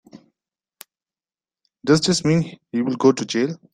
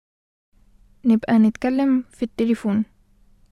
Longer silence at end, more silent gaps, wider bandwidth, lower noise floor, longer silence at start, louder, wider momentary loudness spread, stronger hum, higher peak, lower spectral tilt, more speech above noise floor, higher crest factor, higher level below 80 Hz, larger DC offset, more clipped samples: second, 0.15 s vs 0.65 s; neither; first, 14 kHz vs 10.5 kHz; first, under -90 dBFS vs -55 dBFS; second, 0.15 s vs 1.05 s; about the same, -20 LUFS vs -21 LUFS; about the same, 8 LU vs 8 LU; neither; first, -2 dBFS vs -6 dBFS; second, -5 dB/octave vs -7.5 dB/octave; first, over 71 dB vs 36 dB; first, 20 dB vs 14 dB; about the same, -56 dBFS vs -54 dBFS; neither; neither